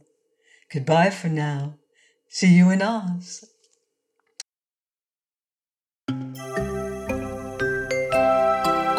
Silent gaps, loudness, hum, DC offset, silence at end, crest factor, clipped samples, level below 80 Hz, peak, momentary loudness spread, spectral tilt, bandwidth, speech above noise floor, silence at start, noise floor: none; -22 LUFS; none; under 0.1%; 0 s; 18 dB; under 0.1%; -50 dBFS; -6 dBFS; 19 LU; -6.5 dB/octave; 13.5 kHz; over 69 dB; 0.7 s; under -90 dBFS